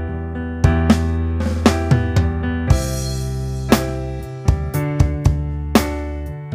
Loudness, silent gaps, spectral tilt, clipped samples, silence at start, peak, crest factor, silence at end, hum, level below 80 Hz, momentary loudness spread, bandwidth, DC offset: -19 LUFS; none; -6.5 dB/octave; under 0.1%; 0 s; 0 dBFS; 18 dB; 0 s; none; -24 dBFS; 9 LU; 16 kHz; under 0.1%